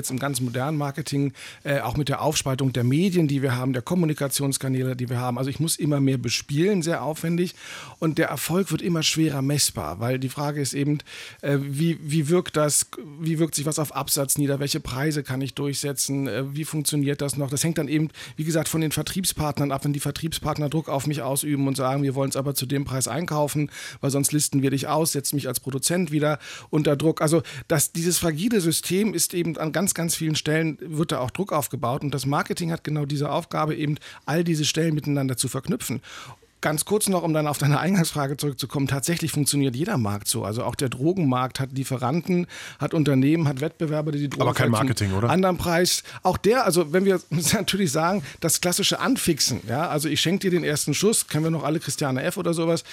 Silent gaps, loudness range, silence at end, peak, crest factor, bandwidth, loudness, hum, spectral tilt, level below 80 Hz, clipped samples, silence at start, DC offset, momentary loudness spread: none; 3 LU; 0 s; -8 dBFS; 16 dB; 17 kHz; -24 LUFS; none; -4.5 dB/octave; -54 dBFS; under 0.1%; 0 s; under 0.1%; 6 LU